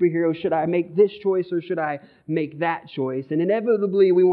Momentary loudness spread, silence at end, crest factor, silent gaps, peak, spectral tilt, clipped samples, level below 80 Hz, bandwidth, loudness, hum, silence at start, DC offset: 9 LU; 0 s; 14 dB; none; -6 dBFS; -11 dB/octave; under 0.1%; -70 dBFS; 4.7 kHz; -22 LUFS; none; 0 s; under 0.1%